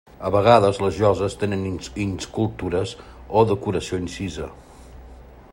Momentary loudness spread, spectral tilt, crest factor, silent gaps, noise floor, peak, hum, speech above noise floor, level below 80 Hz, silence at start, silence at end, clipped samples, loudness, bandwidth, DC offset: 14 LU; -6 dB/octave; 22 dB; none; -43 dBFS; 0 dBFS; none; 22 dB; -44 dBFS; 0.2 s; 0.1 s; under 0.1%; -22 LUFS; 16 kHz; under 0.1%